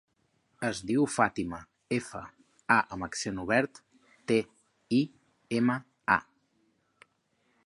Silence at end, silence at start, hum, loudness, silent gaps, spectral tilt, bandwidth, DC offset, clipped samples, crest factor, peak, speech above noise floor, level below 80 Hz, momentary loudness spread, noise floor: 1.45 s; 0.6 s; none; -30 LUFS; none; -5 dB/octave; 11.5 kHz; under 0.1%; under 0.1%; 24 dB; -8 dBFS; 44 dB; -62 dBFS; 17 LU; -73 dBFS